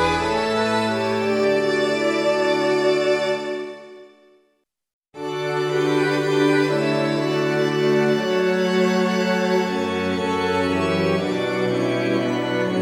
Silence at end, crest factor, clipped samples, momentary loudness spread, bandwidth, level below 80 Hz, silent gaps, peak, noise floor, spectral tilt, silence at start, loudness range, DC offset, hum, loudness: 0 s; 14 dB; under 0.1%; 4 LU; 14 kHz; -54 dBFS; 4.93-5.02 s; -6 dBFS; -68 dBFS; -5.5 dB/octave; 0 s; 5 LU; under 0.1%; none; -20 LUFS